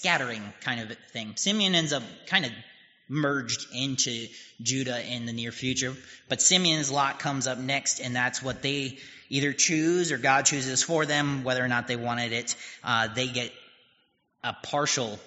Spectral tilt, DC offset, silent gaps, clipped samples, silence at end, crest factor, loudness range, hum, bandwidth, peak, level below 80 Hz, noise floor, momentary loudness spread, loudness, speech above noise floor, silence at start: -2.5 dB/octave; under 0.1%; none; under 0.1%; 0.05 s; 22 dB; 5 LU; none; 8 kHz; -6 dBFS; -66 dBFS; -70 dBFS; 12 LU; -27 LUFS; 42 dB; 0 s